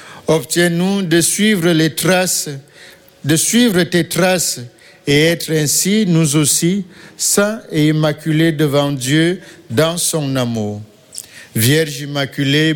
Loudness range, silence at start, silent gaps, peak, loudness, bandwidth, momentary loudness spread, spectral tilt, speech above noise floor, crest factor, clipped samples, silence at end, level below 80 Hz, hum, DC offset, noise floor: 3 LU; 0 s; none; -2 dBFS; -15 LUFS; 17.5 kHz; 13 LU; -4 dB/octave; 20 dB; 14 dB; under 0.1%; 0 s; -50 dBFS; none; under 0.1%; -35 dBFS